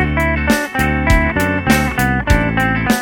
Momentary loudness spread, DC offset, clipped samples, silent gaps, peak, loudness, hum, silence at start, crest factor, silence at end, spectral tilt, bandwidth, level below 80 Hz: 2 LU; under 0.1%; under 0.1%; none; 0 dBFS; -15 LUFS; none; 0 s; 14 dB; 0 s; -5.5 dB/octave; 18.5 kHz; -22 dBFS